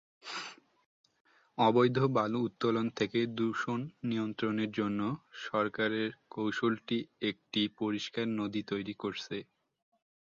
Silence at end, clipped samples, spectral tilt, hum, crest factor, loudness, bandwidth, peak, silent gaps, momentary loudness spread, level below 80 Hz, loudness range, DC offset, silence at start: 0.9 s; under 0.1%; -6 dB/octave; none; 20 dB; -33 LUFS; 7.8 kHz; -12 dBFS; 0.86-1.04 s, 1.20-1.25 s; 12 LU; -72 dBFS; 4 LU; under 0.1%; 0.25 s